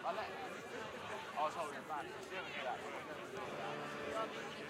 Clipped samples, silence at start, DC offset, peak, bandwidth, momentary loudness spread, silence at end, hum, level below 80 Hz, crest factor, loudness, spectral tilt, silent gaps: under 0.1%; 0 s; under 0.1%; -26 dBFS; 16 kHz; 6 LU; 0 s; none; -78 dBFS; 18 dB; -44 LUFS; -3.5 dB/octave; none